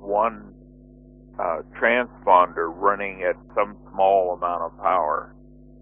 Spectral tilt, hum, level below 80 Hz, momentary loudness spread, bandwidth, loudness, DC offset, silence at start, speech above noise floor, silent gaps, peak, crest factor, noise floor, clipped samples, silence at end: -9 dB/octave; none; -52 dBFS; 10 LU; 3.7 kHz; -22 LUFS; under 0.1%; 0 s; 25 dB; none; -2 dBFS; 22 dB; -47 dBFS; under 0.1%; 0.55 s